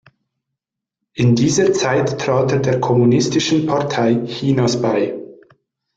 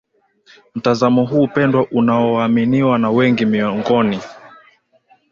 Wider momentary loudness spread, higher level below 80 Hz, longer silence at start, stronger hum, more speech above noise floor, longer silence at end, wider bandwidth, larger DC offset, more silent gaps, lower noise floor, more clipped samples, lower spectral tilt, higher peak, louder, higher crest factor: about the same, 5 LU vs 6 LU; about the same, -52 dBFS vs -54 dBFS; first, 1.15 s vs 0.75 s; neither; first, 67 dB vs 40 dB; second, 0.6 s vs 0.85 s; first, 9 kHz vs 7.2 kHz; neither; neither; first, -82 dBFS vs -55 dBFS; neither; second, -5.5 dB/octave vs -7.5 dB/octave; about the same, -4 dBFS vs -2 dBFS; about the same, -16 LUFS vs -15 LUFS; about the same, 14 dB vs 14 dB